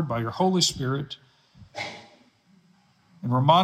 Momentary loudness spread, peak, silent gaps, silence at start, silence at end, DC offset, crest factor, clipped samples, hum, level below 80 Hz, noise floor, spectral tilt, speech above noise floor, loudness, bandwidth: 20 LU; -6 dBFS; none; 0 s; 0 s; under 0.1%; 20 dB; under 0.1%; none; -60 dBFS; -61 dBFS; -4.5 dB/octave; 38 dB; -25 LUFS; 15 kHz